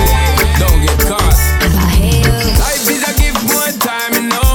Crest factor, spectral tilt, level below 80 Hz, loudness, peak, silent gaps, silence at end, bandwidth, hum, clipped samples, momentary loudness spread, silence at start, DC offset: 10 dB; -4 dB/octave; -14 dBFS; -12 LUFS; 0 dBFS; none; 0 s; over 20 kHz; none; under 0.1%; 2 LU; 0 s; under 0.1%